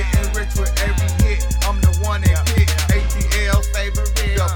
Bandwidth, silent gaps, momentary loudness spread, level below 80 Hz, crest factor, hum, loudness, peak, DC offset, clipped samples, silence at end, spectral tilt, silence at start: 19.5 kHz; none; 4 LU; -18 dBFS; 12 dB; none; -18 LUFS; -4 dBFS; under 0.1%; under 0.1%; 0 s; -4.5 dB/octave; 0 s